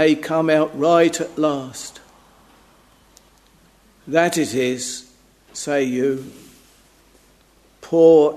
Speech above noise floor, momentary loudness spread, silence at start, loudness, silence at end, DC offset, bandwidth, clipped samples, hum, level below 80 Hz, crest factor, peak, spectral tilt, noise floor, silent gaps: 37 dB; 18 LU; 0 s; -19 LUFS; 0 s; under 0.1%; 13.5 kHz; under 0.1%; none; -60 dBFS; 20 dB; 0 dBFS; -4.5 dB/octave; -55 dBFS; none